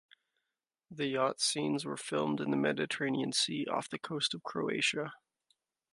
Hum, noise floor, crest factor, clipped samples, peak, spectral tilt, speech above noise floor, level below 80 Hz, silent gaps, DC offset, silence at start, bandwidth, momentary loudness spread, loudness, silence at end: none; -89 dBFS; 18 dB; under 0.1%; -16 dBFS; -3.5 dB/octave; 56 dB; -80 dBFS; none; under 0.1%; 0.9 s; 11.5 kHz; 7 LU; -33 LUFS; 0.75 s